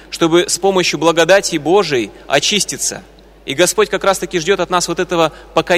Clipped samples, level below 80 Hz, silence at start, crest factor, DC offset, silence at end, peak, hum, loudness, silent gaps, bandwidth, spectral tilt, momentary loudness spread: under 0.1%; -44 dBFS; 0.1 s; 14 dB; under 0.1%; 0 s; 0 dBFS; none; -14 LUFS; none; 16 kHz; -3 dB/octave; 7 LU